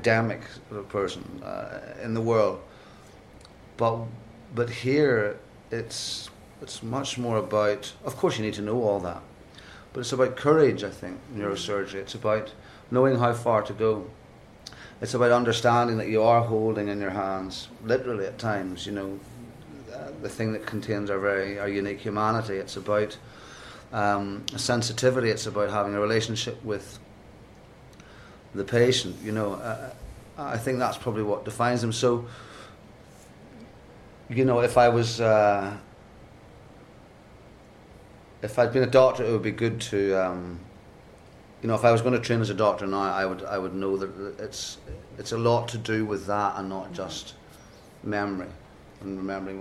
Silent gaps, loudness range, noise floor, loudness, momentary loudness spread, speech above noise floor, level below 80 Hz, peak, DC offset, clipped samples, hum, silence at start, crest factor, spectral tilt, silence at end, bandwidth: none; 6 LU; -50 dBFS; -26 LUFS; 20 LU; 24 dB; -56 dBFS; -4 dBFS; under 0.1%; under 0.1%; none; 0 s; 22 dB; -5.5 dB/octave; 0 s; 14 kHz